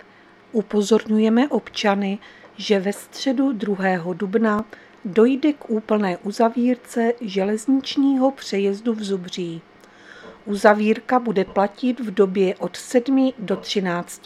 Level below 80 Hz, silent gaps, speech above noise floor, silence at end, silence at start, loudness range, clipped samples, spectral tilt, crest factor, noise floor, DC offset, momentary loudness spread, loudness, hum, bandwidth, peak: -62 dBFS; none; 29 dB; 0.1 s; 0.55 s; 2 LU; under 0.1%; -5.5 dB/octave; 20 dB; -50 dBFS; under 0.1%; 9 LU; -21 LUFS; none; 13.5 kHz; 0 dBFS